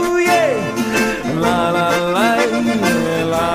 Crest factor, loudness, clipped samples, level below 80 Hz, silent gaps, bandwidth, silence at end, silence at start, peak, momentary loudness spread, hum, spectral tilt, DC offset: 14 dB; -16 LUFS; under 0.1%; -42 dBFS; none; 16 kHz; 0 s; 0 s; -2 dBFS; 4 LU; none; -4.5 dB/octave; under 0.1%